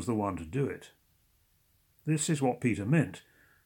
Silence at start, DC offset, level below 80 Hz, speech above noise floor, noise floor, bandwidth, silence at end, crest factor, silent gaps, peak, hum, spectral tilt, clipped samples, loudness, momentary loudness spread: 0 s; under 0.1%; -64 dBFS; 39 dB; -69 dBFS; 18 kHz; 0.45 s; 18 dB; none; -14 dBFS; none; -6 dB/octave; under 0.1%; -31 LUFS; 12 LU